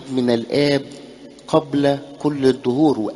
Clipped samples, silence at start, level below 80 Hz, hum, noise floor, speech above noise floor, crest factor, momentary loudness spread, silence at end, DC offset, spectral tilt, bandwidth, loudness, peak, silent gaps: under 0.1%; 0 s; -56 dBFS; none; -39 dBFS; 21 dB; 18 dB; 12 LU; 0 s; under 0.1%; -6.5 dB/octave; 11.5 kHz; -19 LUFS; -2 dBFS; none